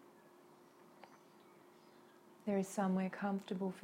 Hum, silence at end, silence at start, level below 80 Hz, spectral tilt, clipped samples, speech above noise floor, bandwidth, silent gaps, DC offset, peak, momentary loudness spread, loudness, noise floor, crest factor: none; 0 s; 0.5 s; -86 dBFS; -6.5 dB/octave; under 0.1%; 25 dB; 15.5 kHz; none; under 0.1%; -24 dBFS; 26 LU; -40 LUFS; -64 dBFS; 18 dB